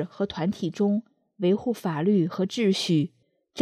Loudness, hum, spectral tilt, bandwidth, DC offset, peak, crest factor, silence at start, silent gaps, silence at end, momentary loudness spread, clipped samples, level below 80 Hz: -26 LUFS; none; -6.5 dB/octave; 14 kHz; under 0.1%; -8 dBFS; 18 dB; 0 s; none; 0 s; 7 LU; under 0.1%; -66 dBFS